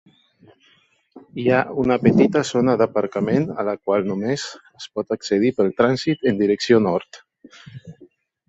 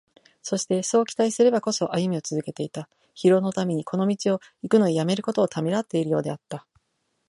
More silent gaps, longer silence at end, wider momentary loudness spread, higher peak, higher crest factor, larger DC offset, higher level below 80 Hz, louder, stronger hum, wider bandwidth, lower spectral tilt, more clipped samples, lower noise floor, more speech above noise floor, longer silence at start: neither; second, 0.55 s vs 0.7 s; about the same, 13 LU vs 13 LU; first, -2 dBFS vs -6 dBFS; about the same, 18 dB vs 18 dB; neither; first, -56 dBFS vs -70 dBFS; first, -20 LUFS vs -24 LUFS; neither; second, 8 kHz vs 11.5 kHz; about the same, -6 dB/octave vs -5.5 dB/octave; neither; second, -59 dBFS vs -74 dBFS; second, 40 dB vs 51 dB; first, 1.15 s vs 0.45 s